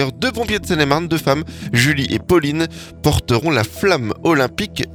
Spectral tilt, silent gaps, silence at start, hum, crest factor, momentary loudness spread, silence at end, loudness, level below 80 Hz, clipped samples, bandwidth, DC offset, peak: -5 dB/octave; none; 0 s; none; 18 dB; 5 LU; 0 s; -17 LUFS; -38 dBFS; under 0.1%; 19 kHz; under 0.1%; 0 dBFS